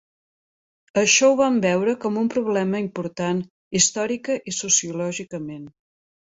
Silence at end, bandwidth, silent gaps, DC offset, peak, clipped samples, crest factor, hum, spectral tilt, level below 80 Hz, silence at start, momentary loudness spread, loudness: 0.7 s; 8 kHz; 3.50-3.71 s; under 0.1%; -4 dBFS; under 0.1%; 20 dB; none; -3 dB/octave; -62 dBFS; 0.95 s; 13 LU; -21 LUFS